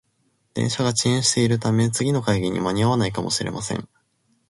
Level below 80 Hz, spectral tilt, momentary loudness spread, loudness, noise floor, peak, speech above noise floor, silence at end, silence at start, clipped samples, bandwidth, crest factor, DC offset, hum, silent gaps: -50 dBFS; -4.5 dB/octave; 9 LU; -22 LUFS; -67 dBFS; -6 dBFS; 46 dB; 0.65 s; 0.55 s; under 0.1%; 11.5 kHz; 18 dB; under 0.1%; none; none